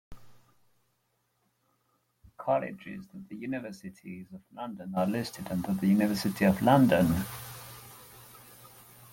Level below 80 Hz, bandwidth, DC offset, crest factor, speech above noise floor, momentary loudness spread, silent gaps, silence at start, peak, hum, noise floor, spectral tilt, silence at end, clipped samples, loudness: -60 dBFS; 17 kHz; under 0.1%; 22 dB; 47 dB; 25 LU; none; 0.1 s; -8 dBFS; none; -76 dBFS; -6.5 dB/octave; 0.45 s; under 0.1%; -28 LUFS